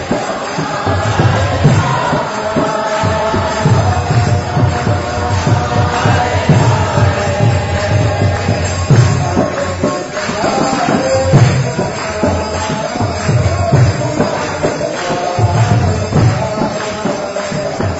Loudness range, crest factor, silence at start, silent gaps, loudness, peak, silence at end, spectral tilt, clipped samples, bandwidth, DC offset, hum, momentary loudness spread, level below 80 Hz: 2 LU; 12 dB; 0 s; none; -14 LUFS; 0 dBFS; 0 s; -6 dB/octave; under 0.1%; 8 kHz; under 0.1%; none; 7 LU; -32 dBFS